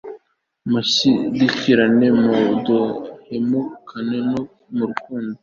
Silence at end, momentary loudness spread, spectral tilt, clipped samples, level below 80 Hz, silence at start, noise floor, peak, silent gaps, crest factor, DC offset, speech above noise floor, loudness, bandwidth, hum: 0.05 s; 14 LU; -5 dB/octave; under 0.1%; -58 dBFS; 0.05 s; -59 dBFS; -2 dBFS; none; 18 dB; under 0.1%; 41 dB; -18 LUFS; 7.4 kHz; none